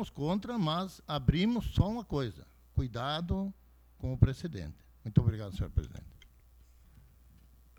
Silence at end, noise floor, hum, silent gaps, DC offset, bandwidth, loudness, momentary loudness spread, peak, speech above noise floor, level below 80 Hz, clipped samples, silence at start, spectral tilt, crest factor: 1.65 s; -60 dBFS; none; none; under 0.1%; 16.5 kHz; -33 LUFS; 12 LU; -8 dBFS; 28 dB; -44 dBFS; under 0.1%; 0 s; -7.5 dB/octave; 26 dB